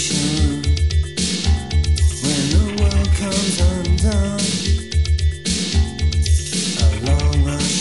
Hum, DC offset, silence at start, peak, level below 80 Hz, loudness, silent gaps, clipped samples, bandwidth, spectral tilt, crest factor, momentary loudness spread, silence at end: none; 0.9%; 0 s; -4 dBFS; -20 dBFS; -18 LUFS; none; under 0.1%; 11.5 kHz; -4.5 dB/octave; 12 dB; 3 LU; 0 s